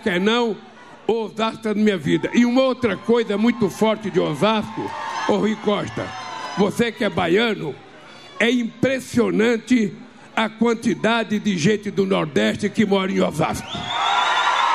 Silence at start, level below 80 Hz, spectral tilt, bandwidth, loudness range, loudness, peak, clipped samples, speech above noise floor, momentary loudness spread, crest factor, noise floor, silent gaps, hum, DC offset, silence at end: 0 s; -56 dBFS; -5 dB/octave; 14 kHz; 2 LU; -20 LUFS; -6 dBFS; under 0.1%; 22 dB; 10 LU; 16 dB; -42 dBFS; none; none; 0.2%; 0 s